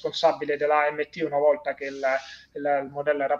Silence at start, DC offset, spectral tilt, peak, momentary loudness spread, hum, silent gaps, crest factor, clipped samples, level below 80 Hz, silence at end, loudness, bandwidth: 0 s; under 0.1%; -4.5 dB/octave; -8 dBFS; 8 LU; none; none; 18 dB; under 0.1%; -68 dBFS; 0 s; -25 LUFS; 7.4 kHz